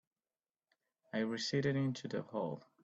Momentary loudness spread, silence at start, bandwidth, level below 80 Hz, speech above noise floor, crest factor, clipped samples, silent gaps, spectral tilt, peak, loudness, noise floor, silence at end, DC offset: 8 LU; 1.15 s; 8.4 kHz; -78 dBFS; over 52 dB; 18 dB; under 0.1%; none; -5.5 dB/octave; -22 dBFS; -38 LUFS; under -90 dBFS; 0.25 s; under 0.1%